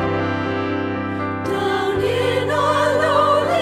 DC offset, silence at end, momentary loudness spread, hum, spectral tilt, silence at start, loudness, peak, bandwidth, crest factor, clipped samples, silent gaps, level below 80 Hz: under 0.1%; 0 s; 8 LU; none; -5.5 dB/octave; 0 s; -19 LUFS; -4 dBFS; 15 kHz; 14 dB; under 0.1%; none; -48 dBFS